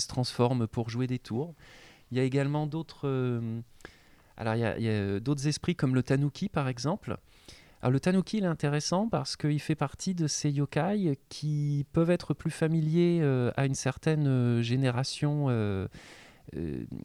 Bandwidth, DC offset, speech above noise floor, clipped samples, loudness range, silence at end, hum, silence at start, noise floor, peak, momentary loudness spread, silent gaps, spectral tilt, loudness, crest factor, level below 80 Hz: 12 kHz; under 0.1%; 25 dB; under 0.1%; 4 LU; 0.05 s; none; 0 s; -54 dBFS; -12 dBFS; 9 LU; none; -6 dB/octave; -30 LUFS; 18 dB; -58 dBFS